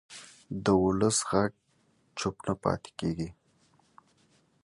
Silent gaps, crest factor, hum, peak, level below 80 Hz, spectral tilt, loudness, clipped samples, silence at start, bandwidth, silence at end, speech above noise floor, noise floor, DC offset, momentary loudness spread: none; 22 dB; none; -10 dBFS; -54 dBFS; -5 dB/octave; -30 LUFS; under 0.1%; 0.1 s; 11.5 kHz; 1.3 s; 40 dB; -69 dBFS; under 0.1%; 16 LU